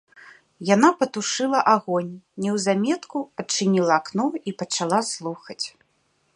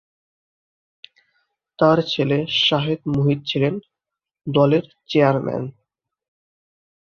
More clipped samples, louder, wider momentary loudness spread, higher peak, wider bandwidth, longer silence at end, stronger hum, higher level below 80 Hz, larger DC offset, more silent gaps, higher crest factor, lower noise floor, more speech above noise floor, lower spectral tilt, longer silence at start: neither; second, -23 LUFS vs -19 LUFS; first, 13 LU vs 10 LU; about the same, -2 dBFS vs -2 dBFS; first, 11.5 kHz vs 6.8 kHz; second, 0.65 s vs 1.3 s; neither; second, -72 dBFS vs -58 dBFS; neither; neither; about the same, 22 dB vs 20 dB; second, -67 dBFS vs -85 dBFS; second, 45 dB vs 66 dB; second, -4 dB/octave vs -7 dB/octave; second, 0.25 s vs 1.8 s